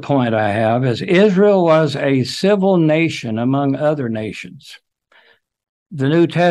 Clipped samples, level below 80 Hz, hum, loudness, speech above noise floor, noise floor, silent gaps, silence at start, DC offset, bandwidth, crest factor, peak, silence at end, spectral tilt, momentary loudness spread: under 0.1%; -60 dBFS; none; -15 LUFS; 38 dB; -53 dBFS; 5.69-5.86 s; 0 s; under 0.1%; 12.5 kHz; 14 dB; -2 dBFS; 0 s; -7 dB/octave; 11 LU